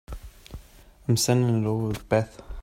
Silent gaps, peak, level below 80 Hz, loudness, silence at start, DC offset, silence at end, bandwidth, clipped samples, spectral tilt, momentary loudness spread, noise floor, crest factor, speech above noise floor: none; -6 dBFS; -44 dBFS; -25 LUFS; 0.1 s; under 0.1%; 0 s; 16 kHz; under 0.1%; -5.5 dB/octave; 23 LU; -51 dBFS; 20 dB; 27 dB